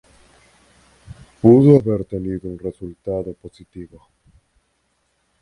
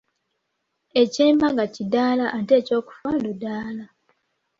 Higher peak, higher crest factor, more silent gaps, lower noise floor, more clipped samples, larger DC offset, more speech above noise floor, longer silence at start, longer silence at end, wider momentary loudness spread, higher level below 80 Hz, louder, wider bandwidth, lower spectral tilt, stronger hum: first, 0 dBFS vs -6 dBFS; about the same, 20 dB vs 18 dB; neither; second, -67 dBFS vs -76 dBFS; neither; neither; second, 50 dB vs 55 dB; first, 1.45 s vs 0.95 s; first, 1.55 s vs 0.75 s; first, 27 LU vs 12 LU; first, -48 dBFS vs -62 dBFS; first, -17 LUFS vs -21 LUFS; first, 11 kHz vs 7.8 kHz; first, -10.5 dB/octave vs -5.5 dB/octave; neither